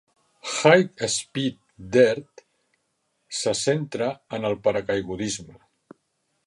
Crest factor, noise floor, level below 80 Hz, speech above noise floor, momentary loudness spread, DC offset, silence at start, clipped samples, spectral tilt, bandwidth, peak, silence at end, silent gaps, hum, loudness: 24 dB; -73 dBFS; -60 dBFS; 51 dB; 12 LU; under 0.1%; 0.45 s; under 0.1%; -4 dB/octave; 11.5 kHz; 0 dBFS; 0.95 s; none; none; -23 LUFS